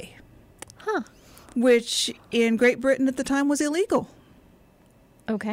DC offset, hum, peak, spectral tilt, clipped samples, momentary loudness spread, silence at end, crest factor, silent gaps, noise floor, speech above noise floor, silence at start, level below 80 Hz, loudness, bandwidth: under 0.1%; none; -8 dBFS; -3.5 dB/octave; under 0.1%; 20 LU; 0 s; 16 dB; none; -56 dBFS; 34 dB; 0 s; -58 dBFS; -24 LUFS; 16 kHz